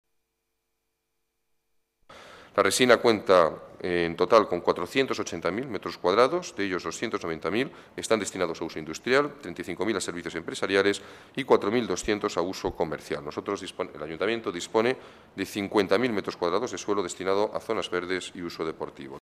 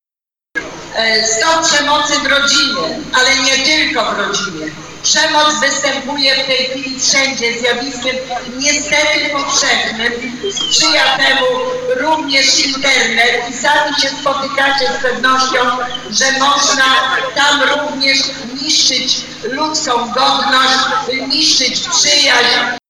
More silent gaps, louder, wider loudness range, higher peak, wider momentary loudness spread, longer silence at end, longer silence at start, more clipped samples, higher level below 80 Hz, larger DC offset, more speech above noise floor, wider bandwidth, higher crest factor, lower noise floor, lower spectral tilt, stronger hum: neither; second, -27 LUFS vs -11 LUFS; first, 6 LU vs 2 LU; second, -4 dBFS vs 0 dBFS; first, 13 LU vs 8 LU; about the same, 0.05 s vs 0.1 s; first, 2.1 s vs 0.55 s; neither; second, -60 dBFS vs -48 dBFS; neither; second, 53 dB vs 76 dB; about the same, 14.5 kHz vs 15.5 kHz; first, 24 dB vs 14 dB; second, -79 dBFS vs -89 dBFS; first, -4 dB/octave vs -0.5 dB/octave; neither